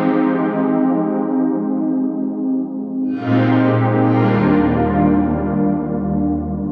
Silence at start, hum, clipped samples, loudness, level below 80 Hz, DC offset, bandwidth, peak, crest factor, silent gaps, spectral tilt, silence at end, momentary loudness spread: 0 s; none; under 0.1%; -17 LUFS; -38 dBFS; under 0.1%; 4.9 kHz; -2 dBFS; 14 dB; none; -11 dB/octave; 0 s; 6 LU